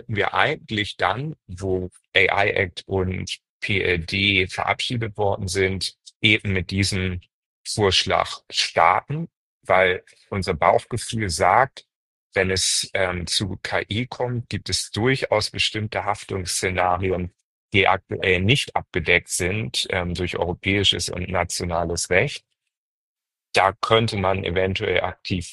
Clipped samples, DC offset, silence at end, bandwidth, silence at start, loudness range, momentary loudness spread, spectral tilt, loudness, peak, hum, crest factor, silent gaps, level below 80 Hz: under 0.1%; under 0.1%; 0 s; 12.5 kHz; 0.1 s; 2 LU; 10 LU; -3.5 dB/octave; -22 LUFS; -2 dBFS; none; 20 dB; 3.49-3.60 s, 6.16-6.20 s, 7.33-7.65 s, 9.37-9.61 s, 11.95-12.30 s, 17.44-17.69 s, 22.77-23.16 s; -46 dBFS